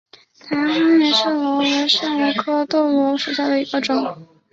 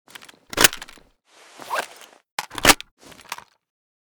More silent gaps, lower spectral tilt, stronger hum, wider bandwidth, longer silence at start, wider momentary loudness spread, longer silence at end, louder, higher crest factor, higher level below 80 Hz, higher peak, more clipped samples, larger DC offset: second, none vs 2.32-2.38 s, 2.91-2.97 s; first, -3.5 dB/octave vs -1 dB/octave; neither; second, 7.8 kHz vs over 20 kHz; about the same, 0.45 s vs 0.55 s; second, 7 LU vs 23 LU; second, 0.3 s vs 0.75 s; about the same, -18 LUFS vs -19 LUFS; second, 16 dB vs 26 dB; second, -66 dBFS vs -44 dBFS; about the same, -2 dBFS vs 0 dBFS; neither; neither